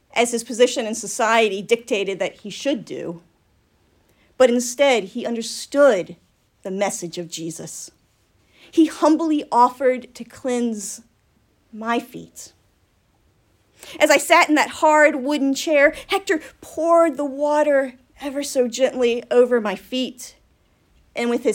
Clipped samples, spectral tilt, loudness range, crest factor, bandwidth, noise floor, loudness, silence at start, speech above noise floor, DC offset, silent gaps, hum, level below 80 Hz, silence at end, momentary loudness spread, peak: under 0.1%; -3 dB/octave; 7 LU; 20 dB; 16.5 kHz; -62 dBFS; -19 LUFS; 0.15 s; 42 dB; under 0.1%; none; none; -62 dBFS; 0 s; 17 LU; 0 dBFS